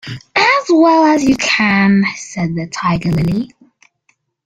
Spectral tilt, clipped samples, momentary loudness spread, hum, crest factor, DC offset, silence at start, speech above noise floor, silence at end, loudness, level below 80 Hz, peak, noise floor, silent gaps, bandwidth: -5 dB/octave; under 0.1%; 10 LU; none; 14 dB; under 0.1%; 0.05 s; 48 dB; 1 s; -13 LUFS; -42 dBFS; 0 dBFS; -61 dBFS; none; 9.6 kHz